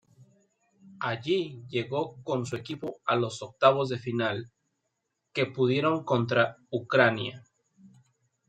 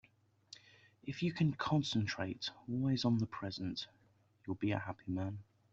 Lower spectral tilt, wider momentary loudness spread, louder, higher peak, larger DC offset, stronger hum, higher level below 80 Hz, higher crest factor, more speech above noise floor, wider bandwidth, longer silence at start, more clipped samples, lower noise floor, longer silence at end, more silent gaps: about the same, -6 dB/octave vs -6 dB/octave; second, 12 LU vs 18 LU; first, -28 LUFS vs -38 LUFS; first, -4 dBFS vs -20 dBFS; neither; neither; about the same, -72 dBFS vs -70 dBFS; about the same, 24 dB vs 20 dB; first, 53 dB vs 33 dB; first, 9.2 kHz vs 8 kHz; first, 0.85 s vs 0.5 s; neither; first, -81 dBFS vs -70 dBFS; first, 0.6 s vs 0.3 s; neither